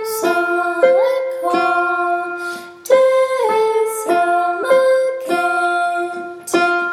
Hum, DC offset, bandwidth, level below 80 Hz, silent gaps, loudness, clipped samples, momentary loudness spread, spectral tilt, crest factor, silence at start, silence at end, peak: none; under 0.1%; 16.5 kHz; -68 dBFS; none; -16 LUFS; under 0.1%; 8 LU; -3 dB/octave; 14 dB; 0 s; 0 s; -2 dBFS